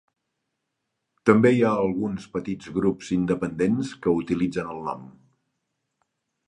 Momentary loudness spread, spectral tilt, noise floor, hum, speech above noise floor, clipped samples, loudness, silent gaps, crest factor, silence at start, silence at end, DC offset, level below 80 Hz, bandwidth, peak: 13 LU; -7.5 dB/octave; -80 dBFS; none; 57 dB; under 0.1%; -24 LUFS; none; 24 dB; 1.25 s; 1.35 s; under 0.1%; -56 dBFS; 10.5 kHz; -2 dBFS